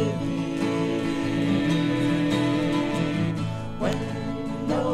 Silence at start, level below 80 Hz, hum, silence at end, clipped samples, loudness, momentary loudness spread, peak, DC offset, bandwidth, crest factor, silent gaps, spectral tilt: 0 s; -46 dBFS; none; 0 s; under 0.1%; -25 LUFS; 6 LU; -12 dBFS; under 0.1%; 12.5 kHz; 14 dB; none; -6.5 dB/octave